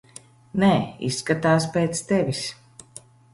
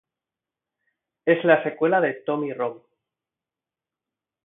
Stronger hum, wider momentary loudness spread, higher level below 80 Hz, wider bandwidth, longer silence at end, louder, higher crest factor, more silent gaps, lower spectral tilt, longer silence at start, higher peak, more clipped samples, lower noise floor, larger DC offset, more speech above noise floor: neither; about the same, 12 LU vs 11 LU; first, -56 dBFS vs -78 dBFS; first, 11.5 kHz vs 3.9 kHz; second, 0.8 s vs 1.7 s; about the same, -23 LUFS vs -22 LUFS; second, 18 dB vs 24 dB; neither; second, -5.5 dB/octave vs -10.5 dB/octave; second, 0.55 s vs 1.25 s; second, -6 dBFS vs -2 dBFS; neither; second, -48 dBFS vs -90 dBFS; neither; second, 26 dB vs 68 dB